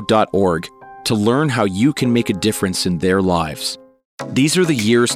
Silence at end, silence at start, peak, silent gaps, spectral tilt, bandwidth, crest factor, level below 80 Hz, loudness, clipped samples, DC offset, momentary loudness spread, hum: 0 s; 0 s; -2 dBFS; 4.05-4.18 s; -5 dB/octave; 17 kHz; 16 dB; -46 dBFS; -17 LUFS; under 0.1%; under 0.1%; 9 LU; none